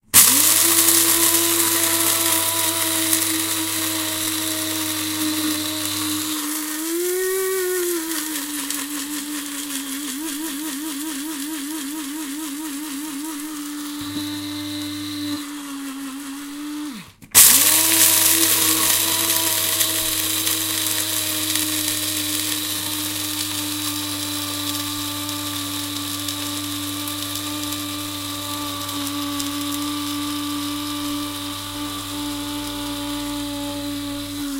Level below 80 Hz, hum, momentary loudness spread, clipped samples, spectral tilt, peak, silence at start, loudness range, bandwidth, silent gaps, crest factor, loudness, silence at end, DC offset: -54 dBFS; none; 15 LU; under 0.1%; -1 dB/octave; 0 dBFS; 0.15 s; 14 LU; 17 kHz; none; 22 dB; -19 LUFS; 0 s; under 0.1%